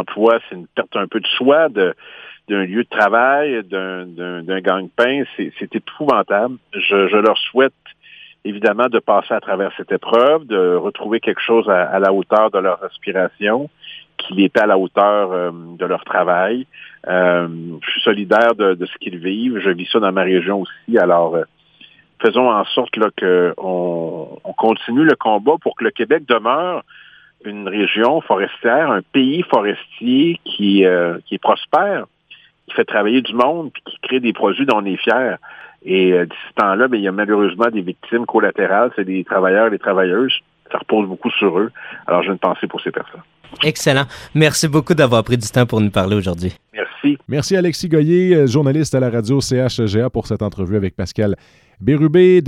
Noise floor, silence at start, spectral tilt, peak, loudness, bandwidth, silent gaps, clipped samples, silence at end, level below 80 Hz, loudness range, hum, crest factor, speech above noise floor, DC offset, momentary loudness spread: -47 dBFS; 0 s; -5.5 dB/octave; 0 dBFS; -16 LUFS; 15.5 kHz; none; under 0.1%; 0 s; -54 dBFS; 2 LU; none; 16 dB; 31 dB; under 0.1%; 11 LU